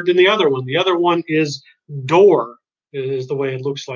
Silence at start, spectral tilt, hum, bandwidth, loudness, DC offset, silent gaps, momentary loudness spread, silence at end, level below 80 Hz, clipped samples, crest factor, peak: 0 s; -5.5 dB/octave; none; 7.4 kHz; -16 LUFS; under 0.1%; none; 18 LU; 0 s; -68 dBFS; under 0.1%; 16 dB; -2 dBFS